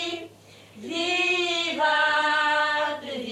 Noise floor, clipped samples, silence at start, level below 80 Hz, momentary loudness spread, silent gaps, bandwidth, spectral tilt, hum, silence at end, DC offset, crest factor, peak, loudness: -50 dBFS; under 0.1%; 0 s; -74 dBFS; 11 LU; none; 13.5 kHz; -1.5 dB/octave; none; 0 s; under 0.1%; 14 dB; -10 dBFS; -23 LUFS